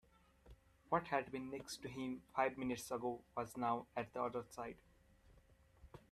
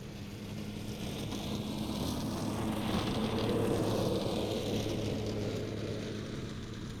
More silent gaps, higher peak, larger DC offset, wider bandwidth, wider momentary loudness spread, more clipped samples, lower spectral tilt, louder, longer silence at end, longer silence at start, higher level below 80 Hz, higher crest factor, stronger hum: neither; second, -24 dBFS vs -20 dBFS; neither; second, 14.5 kHz vs 19 kHz; about the same, 11 LU vs 10 LU; neither; about the same, -5 dB/octave vs -6 dB/octave; second, -43 LUFS vs -36 LUFS; about the same, 0.1 s vs 0 s; first, 0.45 s vs 0 s; second, -70 dBFS vs -50 dBFS; first, 22 dB vs 16 dB; neither